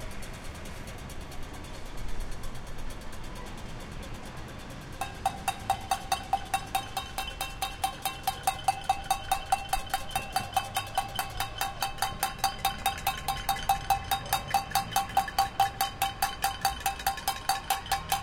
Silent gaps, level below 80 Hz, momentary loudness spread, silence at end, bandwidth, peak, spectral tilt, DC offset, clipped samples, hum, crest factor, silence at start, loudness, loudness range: none; -44 dBFS; 13 LU; 0 s; 17 kHz; -10 dBFS; -2 dB/octave; under 0.1%; under 0.1%; none; 22 dB; 0 s; -31 LUFS; 13 LU